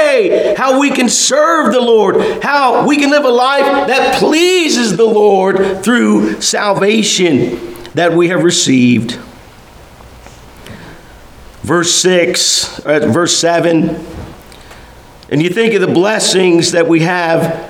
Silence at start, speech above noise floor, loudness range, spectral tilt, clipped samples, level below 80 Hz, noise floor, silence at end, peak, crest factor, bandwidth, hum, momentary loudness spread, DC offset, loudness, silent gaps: 0 s; 26 dB; 4 LU; -3.5 dB/octave; under 0.1%; -44 dBFS; -37 dBFS; 0 s; 0 dBFS; 12 dB; 17.5 kHz; none; 5 LU; under 0.1%; -10 LUFS; none